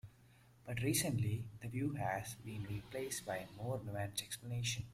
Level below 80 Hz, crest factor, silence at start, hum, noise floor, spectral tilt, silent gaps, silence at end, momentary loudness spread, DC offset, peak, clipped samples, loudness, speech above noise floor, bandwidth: -66 dBFS; 18 dB; 0.05 s; none; -65 dBFS; -4.5 dB/octave; none; 0 s; 10 LU; under 0.1%; -22 dBFS; under 0.1%; -41 LUFS; 25 dB; 16 kHz